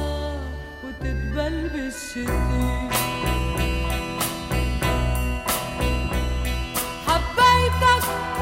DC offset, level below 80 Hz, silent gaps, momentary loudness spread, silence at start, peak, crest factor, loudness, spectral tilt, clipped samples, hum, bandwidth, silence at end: under 0.1%; -28 dBFS; none; 12 LU; 0 s; -6 dBFS; 18 dB; -23 LUFS; -4.5 dB/octave; under 0.1%; none; 16.5 kHz; 0 s